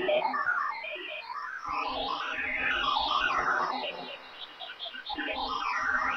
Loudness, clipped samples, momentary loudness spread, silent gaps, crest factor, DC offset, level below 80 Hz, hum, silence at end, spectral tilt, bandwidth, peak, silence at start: -30 LUFS; under 0.1%; 12 LU; none; 16 dB; under 0.1%; -58 dBFS; none; 0 s; -2.5 dB/octave; 8.4 kHz; -16 dBFS; 0 s